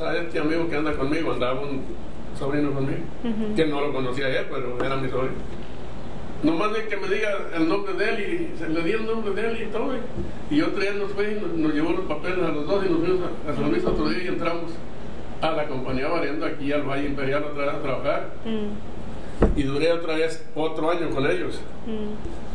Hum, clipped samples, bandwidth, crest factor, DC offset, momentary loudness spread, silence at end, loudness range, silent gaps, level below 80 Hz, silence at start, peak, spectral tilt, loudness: none; under 0.1%; 10 kHz; 22 dB; 6%; 11 LU; 0 s; 2 LU; none; -40 dBFS; 0 s; -4 dBFS; -6.5 dB/octave; -26 LUFS